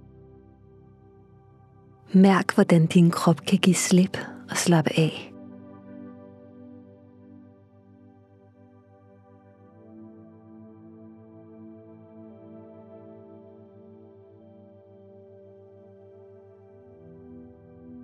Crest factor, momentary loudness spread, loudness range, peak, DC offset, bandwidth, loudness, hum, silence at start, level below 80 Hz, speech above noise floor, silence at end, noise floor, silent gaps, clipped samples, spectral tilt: 24 dB; 29 LU; 27 LU; -4 dBFS; under 0.1%; 14 kHz; -21 LUFS; none; 2.1 s; -70 dBFS; 35 dB; 0 s; -54 dBFS; none; under 0.1%; -5.5 dB/octave